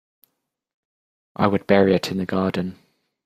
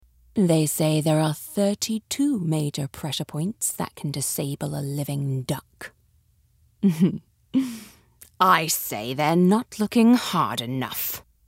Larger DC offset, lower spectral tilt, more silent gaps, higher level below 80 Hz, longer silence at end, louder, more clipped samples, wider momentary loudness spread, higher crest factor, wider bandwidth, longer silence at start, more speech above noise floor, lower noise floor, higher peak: neither; first, -7 dB/octave vs -5 dB/octave; neither; about the same, -60 dBFS vs -62 dBFS; first, 0.5 s vs 0.25 s; first, -21 LUFS vs -24 LUFS; neither; about the same, 13 LU vs 11 LU; about the same, 20 dB vs 20 dB; about the same, 15 kHz vs 16 kHz; first, 1.4 s vs 0.35 s; first, 55 dB vs 39 dB; first, -75 dBFS vs -62 dBFS; about the same, -2 dBFS vs -4 dBFS